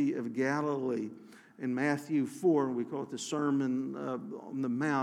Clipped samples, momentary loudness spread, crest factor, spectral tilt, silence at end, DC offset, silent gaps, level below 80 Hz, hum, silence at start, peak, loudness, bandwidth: under 0.1%; 10 LU; 16 dB; -6 dB/octave; 0 s; under 0.1%; none; under -90 dBFS; none; 0 s; -16 dBFS; -33 LUFS; 13.5 kHz